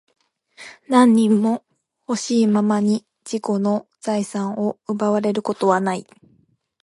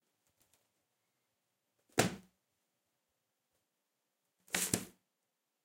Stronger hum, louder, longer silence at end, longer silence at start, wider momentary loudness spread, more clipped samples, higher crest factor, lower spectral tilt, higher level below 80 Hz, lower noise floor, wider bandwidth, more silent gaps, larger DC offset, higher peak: neither; first, -20 LUFS vs -36 LUFS; about the same, 0.8 s vs 0.75 s; second, 0.6 s vs 1.95 s; second, 13 LU vs 16 LU; neither; second, 18 dB vs 38 dB; first, -6 dB/octave vs -3 dB/octave; about the same, -70 dBFS vs -72 dBFS; second, -61 dBFS vs -86 dBFS; second, 11.5 kHz vs 16 kHz; neither; neither; first, -2 dBFS vs -8 dBFS